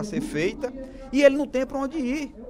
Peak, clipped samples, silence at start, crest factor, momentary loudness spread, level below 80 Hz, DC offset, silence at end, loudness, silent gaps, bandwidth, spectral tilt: -2 dBFS; under 0.1%; 0 s; 22 dB; 14 LU; -46 dBFS; under 0.1%; 0 s; -24 LUFS; none; 14 kHz; -5 dB/octave